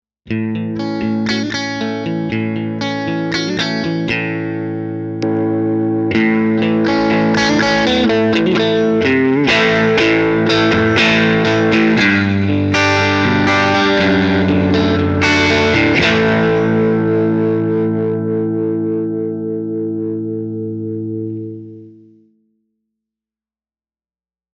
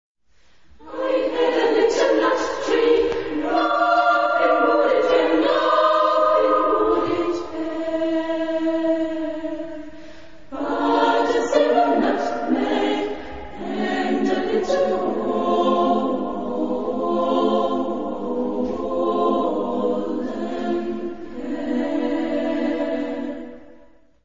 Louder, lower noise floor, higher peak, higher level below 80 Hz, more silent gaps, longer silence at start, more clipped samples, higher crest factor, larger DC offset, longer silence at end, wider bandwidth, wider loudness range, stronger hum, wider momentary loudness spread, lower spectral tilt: first, -15 LUFS vs -21 LUFS; first, under -90 dBFS vs -56 dBFS; first, 0 dBFS vs -4 dBFS; first, -46 dBFS vs -52 dBFS; neither; first, 0.25 s vs 0.1 s; neither; about the same, 14 dB vs 16 dB; second, under 0.1% vs 1%; first, 2.6 s vs 0 s; about the same, 8 kHz vs 7.6 kHz; first, 10 LU vs 7 LU; neither; about the same, 10 LU vs 11 LU; about the same, -6 dB/octave vs -5 dB/octave